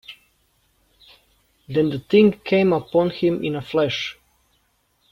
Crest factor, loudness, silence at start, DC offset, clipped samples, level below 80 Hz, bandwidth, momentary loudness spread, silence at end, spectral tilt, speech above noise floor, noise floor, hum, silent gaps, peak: 18 dB; -20 LUFS; 0.1 s; under 0.1%; under 0.1%; -58 dBFS; 13 kHz; 10 LU; 1 s; -7 dB/octave; 46 dB; -66 dBFS; none; none; -4 dBFS